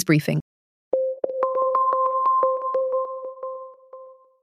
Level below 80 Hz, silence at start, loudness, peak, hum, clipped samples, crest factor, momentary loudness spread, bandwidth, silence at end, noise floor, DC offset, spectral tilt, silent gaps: -70 dBFS; 0 s; -23 LUFS; -4 dBFS; none; under 0.1%; 18 dB; 14 LU; 15 kHz; 0.3 s; -45 dBFS; under 0.1%; -7 dB/octave; 0.41-0.91 s